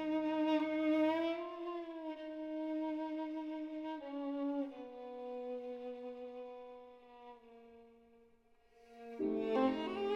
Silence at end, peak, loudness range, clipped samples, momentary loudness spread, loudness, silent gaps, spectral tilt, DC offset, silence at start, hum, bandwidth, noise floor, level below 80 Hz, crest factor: 0 s; -22 dBFS; 13 LU; under 0.1%; 22 LU; -39 LUFS; none; -6 dB/octave; under 0.1%; 0 s; none; 6.4 kHz; -69 dBFS; -76 dBFS; 18 dB